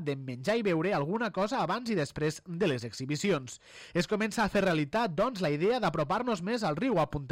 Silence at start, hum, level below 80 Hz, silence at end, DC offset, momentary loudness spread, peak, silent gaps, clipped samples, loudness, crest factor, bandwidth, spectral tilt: 0 s; none; -58 dBFS; 0 s; under 0.1%; 6 LU; -16 dBFS; none; under 0.1%; -30 LUFS; 14 dB; 16 kHz; -5.5 dB/octave